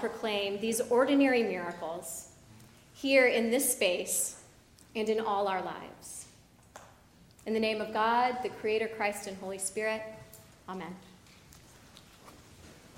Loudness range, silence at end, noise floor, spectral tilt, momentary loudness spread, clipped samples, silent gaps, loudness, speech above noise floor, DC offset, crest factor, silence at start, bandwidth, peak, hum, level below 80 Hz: 9 LU; 0 s; -59 dBFS; -2.5 dB/octave; 20 LU; under 0.1%; none; -30 LUFS; 28 dB; under 0.1%; 20 dB; 0 s; 16 kHz; -12 dBFS; none; -68 dBFS